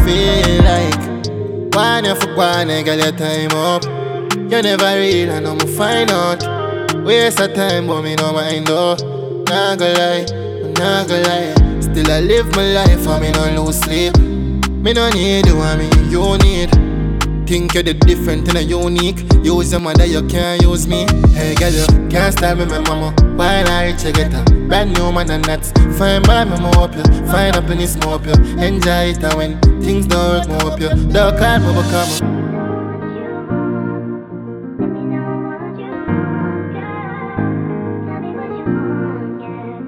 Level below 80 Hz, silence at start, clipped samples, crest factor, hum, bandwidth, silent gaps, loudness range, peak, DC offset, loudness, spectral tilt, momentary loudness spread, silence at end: -18 dBFS; 0 s; under 0.1%; 14 dB; none; 17 kHz; none; 8 LU; 0 dBFS; under 0.1%; -14 LUFS; -5 dB/octave; 10 LU; 0 s